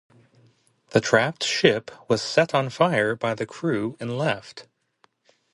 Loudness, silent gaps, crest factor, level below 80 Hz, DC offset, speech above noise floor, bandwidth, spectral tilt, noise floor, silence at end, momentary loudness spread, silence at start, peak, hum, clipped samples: -23 LUFS; none; 22 dB; -64 dBFS; under 0.1%; 42 dB; 11.5 kHz; -4.5 dB/octave; -65 dBFS; 0.9 s; 9 LU; 0.9 s; -2 dBFS; none; under 0.1%